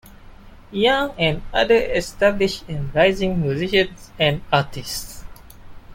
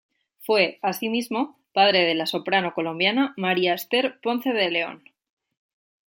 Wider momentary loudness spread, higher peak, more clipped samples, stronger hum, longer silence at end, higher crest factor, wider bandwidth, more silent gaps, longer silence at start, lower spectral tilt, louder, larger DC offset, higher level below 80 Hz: first, 11 LU vs 8 LU; about the same, -4 dBFS vs -4 dBFS; neither; neither; second, 0 s vs 1.1 s; about the same, 18 dB vs 20 dB; about the same, 17 kHz vs 17 kHz; neither; second, 0.05 s vs 0.4 s; about the same, -5 dB/octave vs -4.5 dB/octave; first, -20 LUFS vs -23 LUFS; neither; first, -38 dBFS vs -76 dBFS